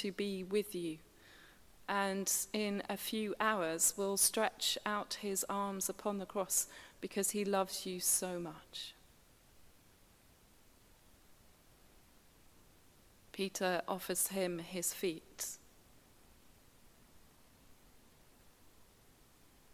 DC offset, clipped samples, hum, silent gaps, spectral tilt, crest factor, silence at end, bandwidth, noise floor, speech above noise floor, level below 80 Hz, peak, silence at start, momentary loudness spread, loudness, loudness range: under 0.1%; under 0.1%; none; none; -2.5 dB/octave; 22 dB; 0.9 s; 16 kHz; -65 dBFS; 28 dB; -72 dBFS; -18 dBFS; 0 s; 13 LU; -36 LUFS; 13 LU